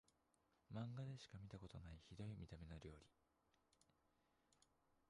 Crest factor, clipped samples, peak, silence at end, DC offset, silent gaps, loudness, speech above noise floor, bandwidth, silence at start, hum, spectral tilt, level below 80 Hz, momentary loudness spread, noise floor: 20 dB; under 0.1%; -40 dBFS; 0.55 s; under 0.1%; none; -57 LUFS; 28 dB; 11 kHz; 0.7 s; none; -7 dB/octave; -70 dBFS; 8 LU; -84 dBFS